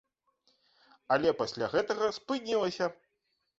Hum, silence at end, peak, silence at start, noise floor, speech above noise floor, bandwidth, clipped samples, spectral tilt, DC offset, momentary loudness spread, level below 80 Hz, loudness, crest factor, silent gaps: none; 0.65 s; -12 dBFS; 1.1 s; -80 dBFS; 49 dB; 8 kHz; under 0.1%; -4.5 dB/octave; under 0.1%; 7 LU; -68 dBFS; -31 LUFS; 20 dB; none